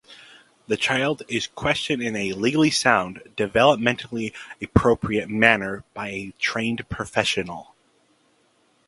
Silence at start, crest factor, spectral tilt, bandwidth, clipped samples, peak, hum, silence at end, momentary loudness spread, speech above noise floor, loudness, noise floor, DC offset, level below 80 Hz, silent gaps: 0.1 s; 24 dB; -4.5 dB/octave; 11.5 kHz; under 0.1%; 0 dBFS; none; 1.25 s; 13 LU; 40 dB; -22 LUFS; -63 dBFS; under 0.1%; -44 dBFS; none